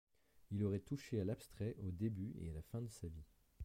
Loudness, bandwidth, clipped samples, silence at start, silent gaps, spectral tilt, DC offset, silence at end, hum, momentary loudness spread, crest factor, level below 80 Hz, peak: -45 LUFS; 16 kHz; under 0.1%; 0.35 s; none; -8 dB/octave; under 0.1%; 0 s; none; 9 LU; 16 dB; -62 dBFS; -30 dBFS